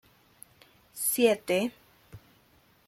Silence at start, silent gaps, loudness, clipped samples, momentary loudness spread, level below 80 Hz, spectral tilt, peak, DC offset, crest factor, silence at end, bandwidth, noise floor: 0.95 s; none; -27 LUFS; under 0.1%; 11 LU; -70 dBFS; -3 dB/octave; -10 dBFS; under 0.1%; 22 dB; 0.7 s; 16.5 kHz; -63 dBFS